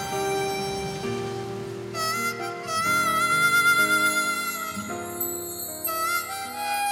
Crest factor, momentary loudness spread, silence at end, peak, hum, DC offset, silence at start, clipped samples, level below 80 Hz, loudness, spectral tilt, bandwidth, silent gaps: 16 dB; 13 LU; 0 s; -10 dBFS; none; under 0.1%; 0 s; under 0.1%; -58 dBFS; -25 LUFS; -2.5 dB/octave; 17 kHz; none